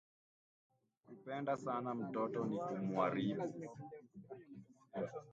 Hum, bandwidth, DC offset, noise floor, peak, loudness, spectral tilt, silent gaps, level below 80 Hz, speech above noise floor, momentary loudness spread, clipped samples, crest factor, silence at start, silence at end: none; 8 kHz; under 0.1%; -62 dBFS; -22 dBFS; -41 LUFS; -7.5 dB/octave; none; -84 dBFS; 20 dB; 19 LU; under 0.1%; 20 dB; 1.1 s; 0 s